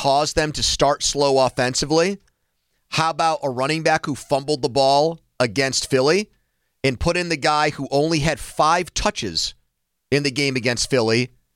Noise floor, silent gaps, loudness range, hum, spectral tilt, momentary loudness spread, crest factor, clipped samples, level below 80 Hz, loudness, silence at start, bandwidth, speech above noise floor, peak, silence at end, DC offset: -73 dBFS; none; 1 LU; none; -3.5 dB/octave; 6 LU; 16 dB; under 0.1%; -42 dBFS; -20 LUFS; 0 s; 16.5 kHz; 53 dB; -4 dBFS; 0.3 s; under 0.1%